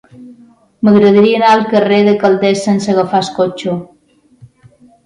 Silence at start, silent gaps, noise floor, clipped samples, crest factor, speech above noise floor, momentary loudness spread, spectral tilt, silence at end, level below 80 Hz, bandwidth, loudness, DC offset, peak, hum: 0.2 s; none; -46 dBFS; under 0.1%; 12 dB; 35 dB; 8 LU; -6 dB/octave; 1.2 s; -54 dBFS; 10.5 kHz; -11 LUFS; under 0.1%; 0 dBFS; none